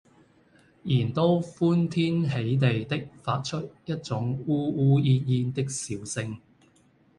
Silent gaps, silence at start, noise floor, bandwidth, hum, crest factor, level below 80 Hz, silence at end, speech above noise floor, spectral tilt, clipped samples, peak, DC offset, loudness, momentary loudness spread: none; 0.85 s; -61 dBFS; 11.5 kHz; none; 18 dB; -60 dBFS; 0.8 s; 36 dB; -6.5 dB/octave; under 0.1%; -10 dBFS; under 0.1%; -26 LUFS; 11 LU